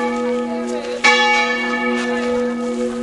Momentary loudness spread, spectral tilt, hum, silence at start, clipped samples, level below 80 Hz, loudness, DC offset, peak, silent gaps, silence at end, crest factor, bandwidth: 10 LU; -2.5 dB/octave; none; 0 s; under 0.1%; -52 dBFS; -17 LUFS; under 0.1%; 0 dBFS; none; 0 s; 18 dB; 11.5 kHz